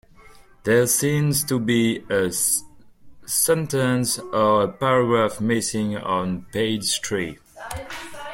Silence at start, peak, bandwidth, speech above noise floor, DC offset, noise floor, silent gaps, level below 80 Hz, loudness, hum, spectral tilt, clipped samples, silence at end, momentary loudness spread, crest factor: 0.65 s; -6 dBFS; 16.5 kHz; 27 dB; under 0.1%; -48 dBFS; none; -52 dBFS; -21 LUFS; none; -4 dB/octave; under 0.1%; 0 s; 13 LU; 16 dB